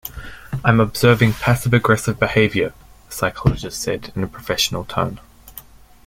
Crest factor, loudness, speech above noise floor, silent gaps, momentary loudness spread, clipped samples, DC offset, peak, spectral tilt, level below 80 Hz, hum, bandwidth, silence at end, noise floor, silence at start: 18 dB; -18 LUFS; 24 dB; none; 20 LU; under 0.1%; under 0.1%; -2 dBFS; -5 dB/octave; -38 dBFS; none; 16.5 kHz; 0.45 s; -42 dBFS; 0.05 s